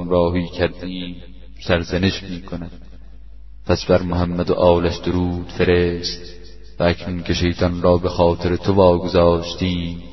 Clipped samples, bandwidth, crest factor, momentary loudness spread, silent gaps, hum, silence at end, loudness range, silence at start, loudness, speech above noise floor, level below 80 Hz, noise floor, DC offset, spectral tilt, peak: under 0.1%; 6.2 kHz; 18 dB; 15 LU; none; none; 0 s; 6 LU; 0 s; -19 LUFS; 22 dB; -36 dBFS; -40 dBFS; 1%; -6.5 dB/octave; 0 dBFS